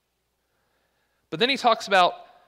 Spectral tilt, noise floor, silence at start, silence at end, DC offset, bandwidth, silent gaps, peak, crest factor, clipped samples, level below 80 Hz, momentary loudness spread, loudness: -3 dB/octave; -74 dBFS; 1.3 s; 0.25 s; under 0.1%; 15 kHz; none; -6 dBFS; 20 dB; under 0.1%; -74 dBFS; 5 LU; -21 LUFS